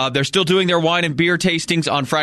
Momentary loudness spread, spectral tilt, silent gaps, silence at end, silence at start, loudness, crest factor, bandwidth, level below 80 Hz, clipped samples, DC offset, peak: 3 LU; -4.5 dB/octave; none; 0 s; 0 s; -17 LUFS; 16 dB; 13 kHz; -52 dBFS; under 0.1%; under 0.1%; -2 dBFS